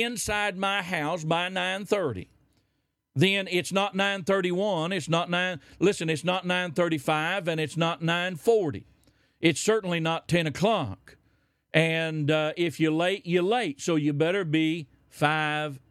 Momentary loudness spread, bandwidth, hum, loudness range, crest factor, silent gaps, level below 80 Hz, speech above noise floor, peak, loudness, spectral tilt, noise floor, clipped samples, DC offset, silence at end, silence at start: 4 LU; 15 kHz; none; 2 LU; 20 dB; none; -62 dBFS; 50 dB; -6 dBFS; -26 LUFS; -5 dB/octave; -76 dBFS; under 0.1%; under 0.1%; 0.15 s; 0 s